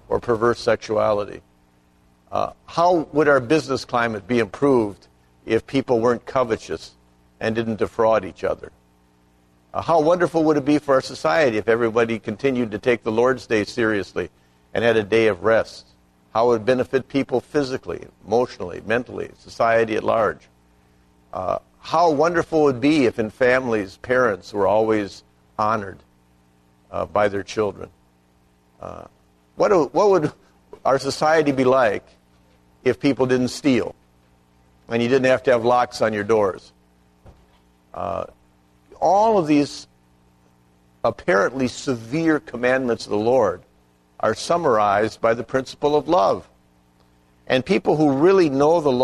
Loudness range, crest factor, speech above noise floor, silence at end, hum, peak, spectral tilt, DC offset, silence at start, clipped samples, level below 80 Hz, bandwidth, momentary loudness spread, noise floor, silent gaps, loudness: 4 LU; 16 dB; 39 dB; 0 s; 60 Hz at -55 dBFS; -4 dBFS; -6 dB/octave; under 0.1%; 0.1 s; under 0.1%; -54 dBFS; 12.5 kHz; 12 LU; -58 dBFS; none; -20 LUFS